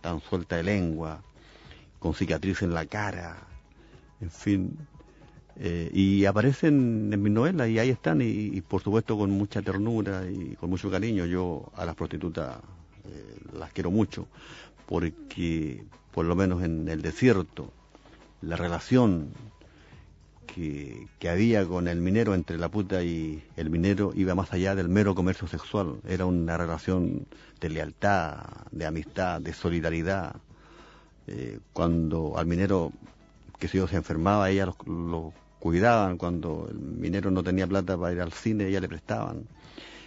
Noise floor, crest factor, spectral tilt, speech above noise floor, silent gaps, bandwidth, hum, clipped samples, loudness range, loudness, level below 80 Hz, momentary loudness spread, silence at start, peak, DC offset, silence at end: -54 dBFS; 22 dB; -7.5 dB/octave; 26 dB; none; 8 kHz; none; under 0.1%; 7 LU; -28 LUFS; -48 dBFS; 17 LU; 0 s; -8 dBFS; under 0.1%; 0 s